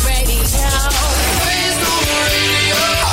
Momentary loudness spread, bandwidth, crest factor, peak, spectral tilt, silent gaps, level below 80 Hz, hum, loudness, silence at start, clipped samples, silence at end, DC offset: 3 LU; 16.5 kHz; 10 dB; -4 dBFS; -2.5 dB/octave; none; -20 dBFS; none; -14 LUFS; 0 s; under 0.1%; 0 s; under 0.1%